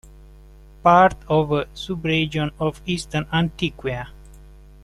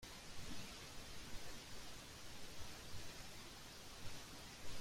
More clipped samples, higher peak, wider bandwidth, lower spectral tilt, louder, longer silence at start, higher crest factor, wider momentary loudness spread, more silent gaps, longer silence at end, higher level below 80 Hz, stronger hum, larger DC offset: neither; first, -2 dBFS vs -34 dBFS; second, 12.5 kHz vs 16 kHz; first, -6 dB/octave vs -2.5 dB/octave; first, -21 LUFS vs -54 LUFS; first, 0.85 s vs 0 s; first, 20 dB vs 14 dB; first, 14 LU vs 3 LU; neither; first, 0.4 s vs 0 s; first, -42 dBFS vs -60 dBFS; neither; neither